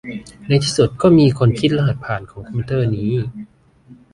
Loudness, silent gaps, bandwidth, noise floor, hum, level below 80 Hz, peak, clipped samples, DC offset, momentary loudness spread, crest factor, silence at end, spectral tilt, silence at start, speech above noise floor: -17 LUFS; none; 11 kHz; -46 dBFS; none; -44 dBFS; -2 dBFS; under 0.1%; under 0.1%; 17 LU; 16 dB; 0.2 s; -6.5 dB/octave; 0.05 s; 30 dB